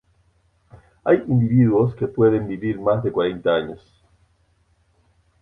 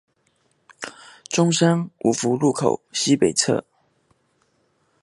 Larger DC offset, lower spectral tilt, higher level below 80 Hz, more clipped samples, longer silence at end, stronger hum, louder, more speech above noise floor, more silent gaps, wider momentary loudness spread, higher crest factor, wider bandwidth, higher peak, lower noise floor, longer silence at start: neither; first, -10.5 dB/octave vs -4.5 dB/octave; first, -52 dBFS vs -62 dBFS; neither; first, 1.65 s vs 1.4 s; neither; about the same, -20 LUFS vs -20 LUFS; about the same, 43 dB vs 46 dB; neither; second, 8 LU vs 18 LU; about the same, 18 dB vs 20 dB; second, 3.9 kHz vs 11.5 kHz; about the same, -4 dBFS vs -2 dBFS; second, -62 dBFS vs -66 dBFS; about the same, 0.75 s vs 0.8 s